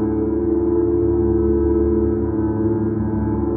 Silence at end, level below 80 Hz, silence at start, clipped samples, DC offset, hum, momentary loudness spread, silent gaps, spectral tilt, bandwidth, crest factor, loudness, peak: 0 s; -28 dBFS; 0 s; under 0.1%; under 0.1%; none; 3 LU; none; -14.5 dB/octave; 2.3 kHz; 10 dB; -19 LUFS; -8 dBFS